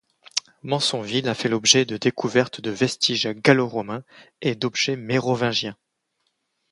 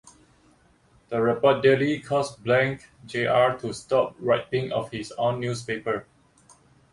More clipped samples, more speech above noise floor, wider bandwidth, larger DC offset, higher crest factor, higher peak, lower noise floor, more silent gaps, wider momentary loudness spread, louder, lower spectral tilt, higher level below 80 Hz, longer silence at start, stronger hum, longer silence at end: neither; first, 52 dB vs 36 dB; about the same, 11.5 kHz vs 11.5 kHz; neither; about the same, 22 dB vs 20 dB; first, 0 dBFS vs -6 dBFS; first, -74 dBFS vs -60 dBFS; neither; about the same, 11 LU vs 11 LU; about the same, -22 LUFS vs -24 LUFS; second, -3.5 dB/octave vs -5.5 dB/octave; about the same, -64 dBFS vs -60 dBFS; second, 0.35 s vs 1.1 s; neither; about the same, 1 s vs 0.9 s